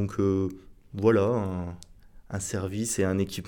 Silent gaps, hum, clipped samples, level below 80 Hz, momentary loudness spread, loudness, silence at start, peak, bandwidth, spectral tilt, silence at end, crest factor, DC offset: none; none; under 0.1%; -52 dBFS; 15 LU; -27 LUFS; 0 s; -10 dBFS; 19 kHz; -6 dB/octave; 0 s; 18 dB; under 0.1%